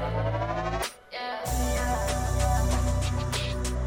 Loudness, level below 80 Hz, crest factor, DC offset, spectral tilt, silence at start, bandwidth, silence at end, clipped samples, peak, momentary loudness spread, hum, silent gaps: -29 LUFS; -32 dBFS; 14 dB; under 0.1%; -5 dB/octave; 0 s; 17 kHz; 0 s; under 0.1%; -12 dBFS; 7 LU; none; none